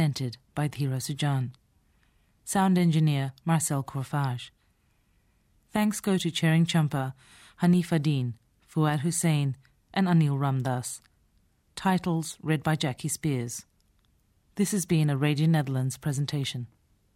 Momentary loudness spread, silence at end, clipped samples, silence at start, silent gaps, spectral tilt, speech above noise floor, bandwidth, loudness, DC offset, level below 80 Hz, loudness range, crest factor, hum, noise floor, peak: 13 LU; 0.5 s; under 0.1%; 0 s; none; -5.5 dB/octave; 41 dB; 16 kHz; -27 LUFS; under 0.1%; -62 dBFS; 3 LU; 16 dB; none; -68 dBFS; -12 dBFS